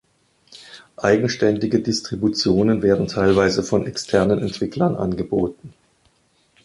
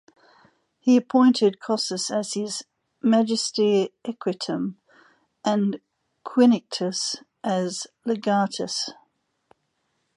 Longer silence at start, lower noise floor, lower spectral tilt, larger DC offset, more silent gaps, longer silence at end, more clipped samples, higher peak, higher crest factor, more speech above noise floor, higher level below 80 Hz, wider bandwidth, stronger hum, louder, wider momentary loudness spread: second, 0.55 s vs 0.85 s; second, -61 dBFS vs -74 dBFS; about the same, -5.5 dB/octave vs -4.5 dB/octave; neither; neither; second, 0.95 s vs 1.25 s; neither; first, -2 dBFS vs -6 dBFS; about the same, 18 dB vs 18 dB; second, 42 dB vs 51 dB; first, -46 dBFS vs -76 dBFS; about the same, 11.5 kHz vs 11.5 kHz; neither; first, -20 LUFS vs -24 LUFS; second, 7 LU vs 12 LU